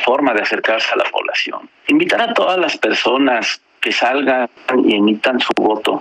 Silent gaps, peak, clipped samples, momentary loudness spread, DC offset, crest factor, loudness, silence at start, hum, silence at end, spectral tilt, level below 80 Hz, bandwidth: none; -2 dBFS; under 0.1%; 4 LU; under 0.1%; 14 dB; -15 LUFS; 0 s; none; 0 s; -3.5 dB/octave; -62 dBFS; 11 kHz